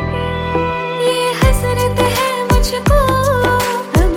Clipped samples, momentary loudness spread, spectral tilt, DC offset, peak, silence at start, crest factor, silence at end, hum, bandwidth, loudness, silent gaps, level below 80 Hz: under 0.1%; 4 LU; -5 dB/octave; under 0.1%; -2 dBFS; 0 s; 12 dB; 0 s; none; 17 kHz; -15 LUFS; none; -20 dBFS